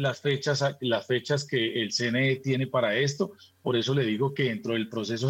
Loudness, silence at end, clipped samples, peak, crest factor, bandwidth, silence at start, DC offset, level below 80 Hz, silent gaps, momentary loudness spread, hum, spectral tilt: -27 LUFS; 0 s; under 0.1%; -14 dBFS; 14 dB; 15.5 kHz; 0 s; under 0.1%; -76 dBFS; none; 5 LU; none; -5 dB/octave